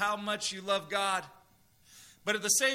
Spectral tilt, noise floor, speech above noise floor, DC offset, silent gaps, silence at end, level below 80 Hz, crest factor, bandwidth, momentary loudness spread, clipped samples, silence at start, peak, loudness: -1 dB/octave; -64 dBFS; 33 dB; under 0.1%; none; 0 s; -74 dBFS; 20 dB; 16 kHz; 10 LU; under 0.1%; 0 s; -12 dBFS; -31 LUFS